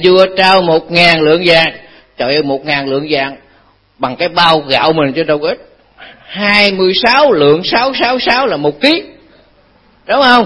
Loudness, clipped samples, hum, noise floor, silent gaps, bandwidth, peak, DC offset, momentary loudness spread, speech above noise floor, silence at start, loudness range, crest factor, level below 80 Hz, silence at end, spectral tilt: -10 LUFS; 0.4%; none; -49 dBFS; none; 11 kHz; 0 dBFS; under 0.1%; 8 LU; 38 dB; 0 s; 4 LU; 12 dB; -46 dBFS; 0 s; -5.5 dB/octave